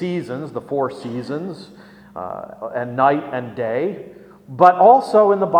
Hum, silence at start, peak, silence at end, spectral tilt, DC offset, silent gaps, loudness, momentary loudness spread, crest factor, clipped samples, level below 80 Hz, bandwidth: none; 0 s; 0 dBFS; 0 s; -7.5 dB/octave; under 0.1%; none; -18 LUFS; 20 LU; 18 dB; under 0.1%; -62 dBFS; 10.5 kHz